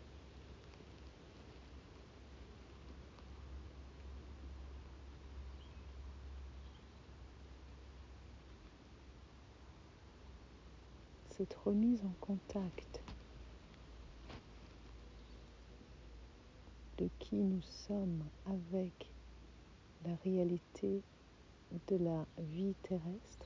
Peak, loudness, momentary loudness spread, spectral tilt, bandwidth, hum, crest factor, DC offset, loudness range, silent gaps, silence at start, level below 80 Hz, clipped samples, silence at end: -26 dBFS; -43 LUFS; 21 LU; -8 dB/octave; 7.6 kHz; none; 20 dB; under 0.1%; 16 LU; none; 0 s; -58 dBFS; under 0.1%; 0 s